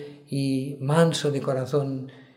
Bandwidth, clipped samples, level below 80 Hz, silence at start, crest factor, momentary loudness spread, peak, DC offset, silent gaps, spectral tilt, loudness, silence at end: 15 kHz; under 0.1%; -70 dBFS; 0 s; 18 dB; 11 LU; -6 dBFS; under 0.1%; none; -6 dB/octave; -25 LUFS; 0.15 s